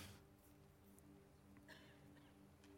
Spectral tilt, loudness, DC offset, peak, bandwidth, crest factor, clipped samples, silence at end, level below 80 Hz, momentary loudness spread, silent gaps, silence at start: -4.5 dB/octave; -66 LUFS; under 0.1%; -44 dBFS; 16.5 kHz; 20 dB; under 0.1%; 0 s; -80 dBFS; 5 LU; none; 0 s